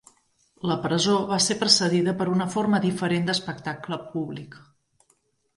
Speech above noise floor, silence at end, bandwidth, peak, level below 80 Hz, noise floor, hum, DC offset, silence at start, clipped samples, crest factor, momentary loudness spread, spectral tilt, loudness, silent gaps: 44 dB; 1 s; 11.5 kHz; -2 dBFS; -64 dBFS; -68 dBFS; none; under 0.1%; 0.65 s; under 0.1%; 22 dB; 14 LU; -4 dB/octave; -24 LUFS; none